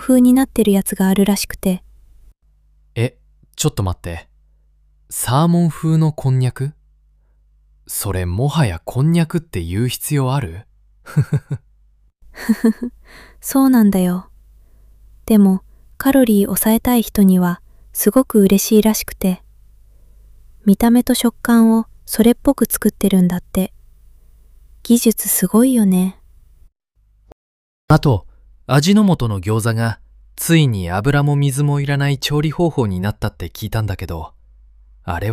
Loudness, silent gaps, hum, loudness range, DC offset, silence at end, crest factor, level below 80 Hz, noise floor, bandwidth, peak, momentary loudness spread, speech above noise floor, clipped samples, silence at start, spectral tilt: -16 LUFS; 27.32-27.88 s; none; 6 LU; under 0.1%; 0 s; 16 dB; -40 dBFS; -56 dBFS; 16 kHz; -2 dBFS; 14 LU; 41 dB; under 0.1%; 0 s; -6 dB/octave